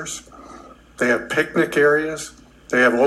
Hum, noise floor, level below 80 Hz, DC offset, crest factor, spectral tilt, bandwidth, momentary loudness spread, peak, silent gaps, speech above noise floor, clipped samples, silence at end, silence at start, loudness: none; -43 dBFS; -54 dBFS; under 0.1%; 16 dB; -4 dB/octave; 14 kHz; 16 LU; -4 dBFS; none; 25 dB; under 0.1%; 0 s; 0 s; -19 LUFS